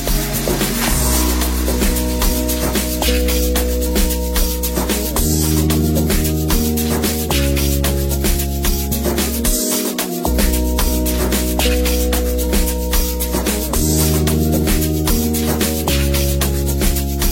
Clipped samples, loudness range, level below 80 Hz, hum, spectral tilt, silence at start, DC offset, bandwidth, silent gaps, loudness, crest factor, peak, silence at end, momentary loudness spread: under 0.1%; 1 LU; -20 dBFS; none; -4.5 dB/octave; 0 s; under 0.1%; 16.5 kHz; none; -17 LUFS; 14 dB; -2 dBFS; 0 s; 3 LU